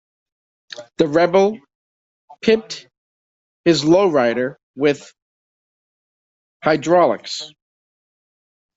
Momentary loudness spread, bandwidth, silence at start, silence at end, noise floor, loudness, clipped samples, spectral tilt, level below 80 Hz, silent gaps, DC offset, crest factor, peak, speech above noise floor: 19 LU; 8 kHz; 0.8 s; 1.3 s; under -90 dBFS; -18 LUFS; under 0.1%; -5 dB/octave; -60 dBFS; 1.75-2.28 s, 2.98-3.64 s, 4.63-4.74 s, 5.22-6.60 s; under 0.1%; 20 dB; 0 dBFS; over 73 dB